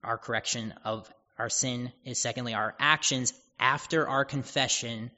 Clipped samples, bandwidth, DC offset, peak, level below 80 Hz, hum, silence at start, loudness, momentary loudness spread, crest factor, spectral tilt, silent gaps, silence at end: under 0.1%; 8 kHz; under 0.1%; -6 dBFS; -66 dBFS; none; 0.05 s; -29 LUFS; 12 LU; 26 dB; -2 dB/octave; none; 0.05 s